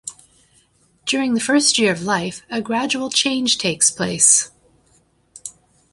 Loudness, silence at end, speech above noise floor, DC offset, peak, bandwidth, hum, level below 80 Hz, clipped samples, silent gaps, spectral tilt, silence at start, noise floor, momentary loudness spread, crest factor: -17 LUFS; 0.45 s; 40 dB; under 0.1%; 0 dBFS; 11.5 kHz; none; -60 dBFS; under 0.1%; none; -2 dB/octave; 0.05 s; -59 dBFS; 21 LU; 20 dB